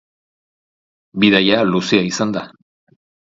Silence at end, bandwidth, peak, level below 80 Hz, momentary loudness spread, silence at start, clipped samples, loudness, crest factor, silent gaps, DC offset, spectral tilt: 0.85 s; 7.8 kHz; 0 dBFS; -56 dBFS; 12 LU; 1.15 s; under 0.1%; -15 LUFS; 18 dB; none; under 0.1%; -4.5 dB/octave